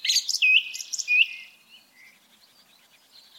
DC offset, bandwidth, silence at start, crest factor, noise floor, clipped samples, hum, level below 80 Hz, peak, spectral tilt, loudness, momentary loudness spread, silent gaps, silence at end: under 0.1%; 17 kHz; 0.05 s; 20 dB; -58 dBFS; under 0.1%; none; under -90 dBFS; -6 dBFS; 6 dB/octave; -20 LUFS; 13 LU; none; 1.95 s